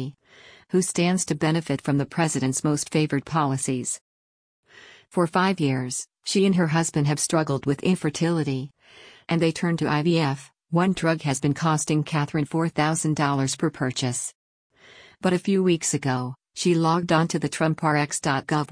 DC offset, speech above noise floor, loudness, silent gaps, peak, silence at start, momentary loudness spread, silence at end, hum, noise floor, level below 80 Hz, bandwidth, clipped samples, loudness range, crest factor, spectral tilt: under 0.1%; 28 dB; -24 LUFS; 4.01-4.63 s, 14.35-14.70 s; -8 dBFS; 0 s; 6 LU; 0 s; none; -51 dBFS; -60 dBFS; 10.5 kHz; under 0.1%; 3 LU; 16 dB; -5 dB/octave